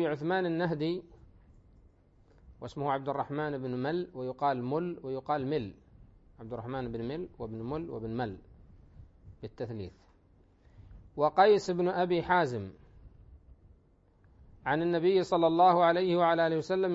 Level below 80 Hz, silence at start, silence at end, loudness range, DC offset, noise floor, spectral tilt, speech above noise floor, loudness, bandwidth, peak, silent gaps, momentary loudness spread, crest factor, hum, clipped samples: -60 dBFS; 0 s; 0 s; 11 LU; under 0.1%; -64 dBFS; -7 dB/octave; 34 dB; -30 LUFS; 8 kHz; -10 dBFS; none; 18 LU; 22 dB; none; under 0.1%